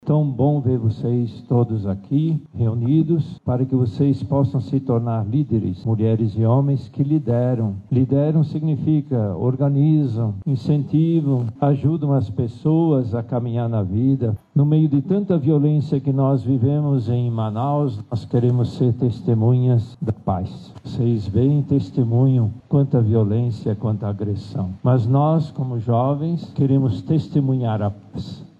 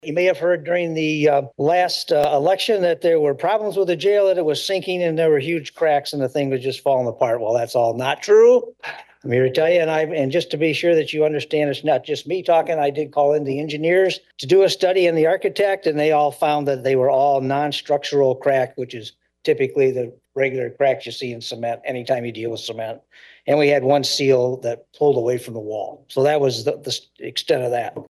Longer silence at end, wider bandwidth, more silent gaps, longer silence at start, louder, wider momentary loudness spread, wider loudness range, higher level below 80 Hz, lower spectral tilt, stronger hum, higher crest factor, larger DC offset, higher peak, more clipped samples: about the same, 0.15 s vs 0.05 s; second, 5.2 kHz vs 12.5 kHz; neither; about the same, 0.05 s vs 0.05 s; about the same, -20 LUFS vs -19 LUFS; second, 6 LU vs 11 LU; about the same, 2 LU vs 4 LU; first, -52 dBFS vs -66 dBFS; first, -11 dB/octave vs -5 dB/octave; neither; about the same, 12 dB vs 16 dB; neither; second, -8 dBFS vs -4 dBFS; neither